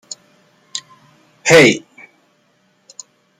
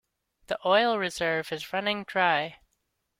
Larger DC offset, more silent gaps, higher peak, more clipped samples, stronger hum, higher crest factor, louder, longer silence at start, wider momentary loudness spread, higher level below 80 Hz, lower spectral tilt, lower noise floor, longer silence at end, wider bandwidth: neither; neither; first, 0 dBFS vs -8 dBFS; neither; neither; about the same, 18 dB vs 20 dB; first, -11 LUFS vs -27 LUFS; first, 0.75 s vs 0.5 s; first, 27 LU vs 9 LU; first, -56 dBFS vs -66 dBFS; about the same, -3.5 dB/octave vs -4 dB/octave; second, -59 dBFS vs -77 dBFS; first, 1.6 s vs 0.65 s; about the same, 16 kHz vs 16.5 kHz